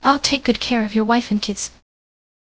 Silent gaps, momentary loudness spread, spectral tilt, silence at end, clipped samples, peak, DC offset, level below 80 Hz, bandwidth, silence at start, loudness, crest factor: none; 9 LU; -3.5 dB/octave; 0.75 s; under 0.1%; 0 dBFS; under 0.1%; -46 dBFS; 8 kHz; 0 s; -19 LUFS; 20 dB